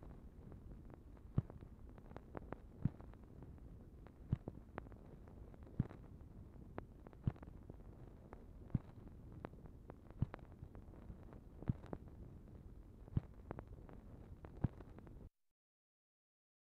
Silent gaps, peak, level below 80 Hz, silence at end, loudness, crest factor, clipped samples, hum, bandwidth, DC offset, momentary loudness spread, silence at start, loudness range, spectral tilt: none; -20 dBFS; -58 dBFS; 1.35 s; -51 LUFS; 30 dB; under 0.1%; none; 5.6 kHz; under 0.1%; 14 LU; 0 s; 1 LU; -10 dB/octave